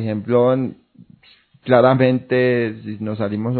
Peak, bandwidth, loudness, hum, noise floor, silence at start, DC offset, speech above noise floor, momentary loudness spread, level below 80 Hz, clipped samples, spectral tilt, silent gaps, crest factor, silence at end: 0 dBFS; 4.5 kHz; -18 LUFS; none; -53 dBFS; 0 s; under 0.1%; 35 dB; 14 LU; -60 dBFS; under 0.1%; -11.5 dB/octave; none; 18 dB; 0 s